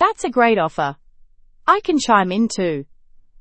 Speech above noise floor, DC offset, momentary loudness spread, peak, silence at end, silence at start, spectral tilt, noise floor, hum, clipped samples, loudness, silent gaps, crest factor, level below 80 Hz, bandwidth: 30 dB; under 0.1%; 9 LU; 0 dBFS; 0.6 s; 0 s; -4.5 dB/octave; -48 dBFS; none; under 0.1%; -18 LUFS; none; 18 dB; -52 dBFS; 8.8 kHz